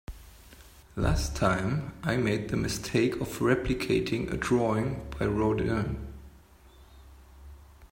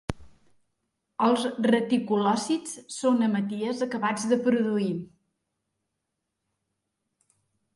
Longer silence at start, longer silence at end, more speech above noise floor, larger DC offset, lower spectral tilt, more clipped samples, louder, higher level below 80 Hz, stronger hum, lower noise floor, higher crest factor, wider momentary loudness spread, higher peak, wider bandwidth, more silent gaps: about the same, 0.1 s vs 0.1 s; second, 0.05 s vs 2.7 s; second, 27 dB vs 57 dB; neither; about the same, -6 dB/octave vs -5 dB/octave; neither; second, -29 LUFS vs -26 LUFS; first, -42 dBFS vs -58 dBFS; neither; second, -55 dBFS vs -82 dBFS; about the same, 20 dB vs 18 dB; about the same, 10 LU vs 11 LU; about the same, -10 dBFS vs -10 dBFS; first, 16 kHz vs 11.5 kHz; neither